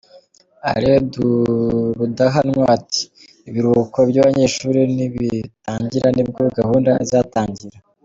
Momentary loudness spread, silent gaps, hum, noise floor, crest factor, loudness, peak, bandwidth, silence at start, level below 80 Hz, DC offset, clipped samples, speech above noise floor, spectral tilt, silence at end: 10 LU; none; none; -49 dBFS; 14 dB; -17 LUFS; -2 dBFS; 7.8 kHz; 0.65 s; -46 dBFS; under 0.1%; under 0.1%; 32 dB; -6 dB/octave; 0.35 s